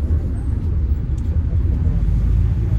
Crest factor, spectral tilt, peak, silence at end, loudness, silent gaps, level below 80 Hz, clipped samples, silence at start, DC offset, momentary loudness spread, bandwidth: 10 dB; -10 dB/octave; -8 dBFS; 0 s; -20 LUFS; none; -20 dBFS; under 0.1%; 0 s; under 0.1%; 3 LU; 3.7 kHz